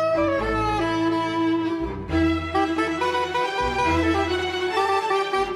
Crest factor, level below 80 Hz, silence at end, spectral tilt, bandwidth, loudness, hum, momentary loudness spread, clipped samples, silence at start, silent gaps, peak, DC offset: 12 dB; -42 dBFS; 0 s; -5.5 dB/octave; 12 kHz; -23 LUFS; none; 3 LU; under 0.1%; 0 s; none; -10 dBFS; under 0.1%